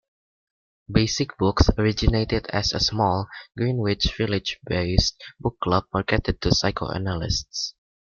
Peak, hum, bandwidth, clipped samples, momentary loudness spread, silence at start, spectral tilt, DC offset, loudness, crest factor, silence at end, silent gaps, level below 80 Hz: -2 dBFS; none; 7.2 kHz; under 0.1%; 7 LU; 0.9 s; -5 dB/octave; under 0.1%; -23 LUFS; 22 dB; 0.45 s; none; -34 dBFS